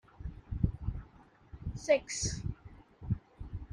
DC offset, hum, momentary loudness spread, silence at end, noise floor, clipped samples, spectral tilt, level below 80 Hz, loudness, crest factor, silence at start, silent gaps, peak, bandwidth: under 0.1%; none; 20 LU; 0 s; -59 dBFS; under 0.1%; -5 dB/octave; -46 dBFS; -36 LUFS; 22 dB; 0.2 s; none; -14 dBFS; 11.5 kHz